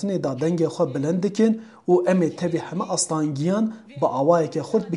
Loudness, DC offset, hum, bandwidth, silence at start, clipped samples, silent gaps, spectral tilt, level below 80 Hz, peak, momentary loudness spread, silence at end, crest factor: -22 LUFS; under 0.1%; none; 11.5 kHz; 0 s; under 0.1%; none; -6 dB/octave; -68 dBFS; -6 dBFS; 7 LU; 0 s; 16 dB